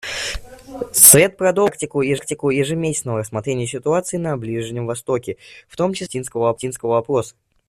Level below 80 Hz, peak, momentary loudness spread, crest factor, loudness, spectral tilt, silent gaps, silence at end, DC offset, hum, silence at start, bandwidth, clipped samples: -46 dBFS; 0 dBFS; 16 LU; 20 dB; -17 LUFS; -3.5 dB/octave; none; 0.4 s; under 0.1%; none; 0.05 s; 15.5 kHz; under 0.1%